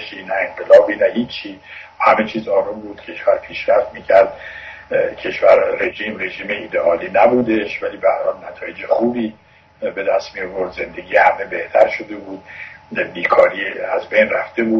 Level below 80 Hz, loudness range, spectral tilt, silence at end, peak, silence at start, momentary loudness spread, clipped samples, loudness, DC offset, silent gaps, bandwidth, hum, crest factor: -54 dBFS; 3 LU; -6 dB/octave; 0 s; 0 dBFS; 0 s; 16 LU; under 0.1%; -17 LUFS; under 0.1%; none; 6.4 kHz; none; 18 dB